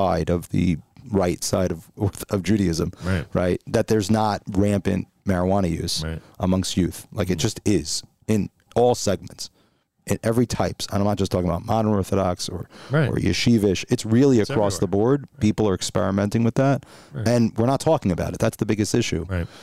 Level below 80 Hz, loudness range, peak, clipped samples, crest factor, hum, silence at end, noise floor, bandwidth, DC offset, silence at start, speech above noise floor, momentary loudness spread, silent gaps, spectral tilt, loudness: -44 dBFS; 3 LU; -6 dBFS; under 0.1%; 16 dB; none; 0 s; -63 dBFS; 15.5 kHz; 0.3%; 0 s; 42 dB; 7 LU; none; -6 dB/octave; -22 LUFS